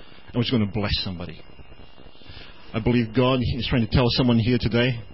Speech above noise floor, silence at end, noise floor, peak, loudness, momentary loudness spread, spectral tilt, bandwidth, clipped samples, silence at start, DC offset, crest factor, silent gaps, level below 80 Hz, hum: 25 dB; 0.1 s; -47 dBFS; -8 dBFS; -22 LUFS; 16 LU; -10.5 dB/octave; 5.8 kHz; under 0.1%; 0.3 s; 0.9%; 16 dB; none; -38 dBFS; none